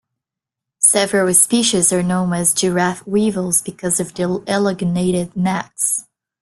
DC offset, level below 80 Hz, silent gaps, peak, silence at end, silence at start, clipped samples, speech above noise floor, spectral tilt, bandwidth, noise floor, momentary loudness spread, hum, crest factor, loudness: under 0.1%; -54 dBFS; none; 0 dBFS; 0.4 s; 0.8 s; under 0.1%; 67 dB; -3.5 dB/octave; 12.5 kHz; -85 dBFS; 8 LU; none; 18 dB; -16 LUFS